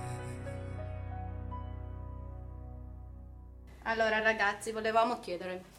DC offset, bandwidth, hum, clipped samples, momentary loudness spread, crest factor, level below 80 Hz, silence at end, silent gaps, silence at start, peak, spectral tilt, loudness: under 0.1%; 14.5 kHz; 60 Hz at -70 dBFS; under 0.1%; 21 LU; 22 dB; -48 dBFS; 0 s; none; 0 s; -14 dBFS; -5 dB/octave; -34 LUFS